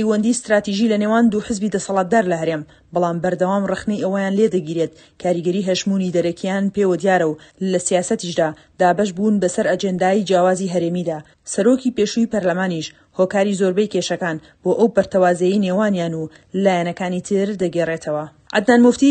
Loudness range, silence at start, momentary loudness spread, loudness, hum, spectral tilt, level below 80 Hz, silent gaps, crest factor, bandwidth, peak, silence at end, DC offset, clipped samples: 2 LU; 0 s; 8 LU; -19 LUFS; none; -5.5 dB/octave; -56 dBFS; none; 18 dB; 9.6 kHz; 0 dBFS; 0 s; under 0.1%; under 0.1%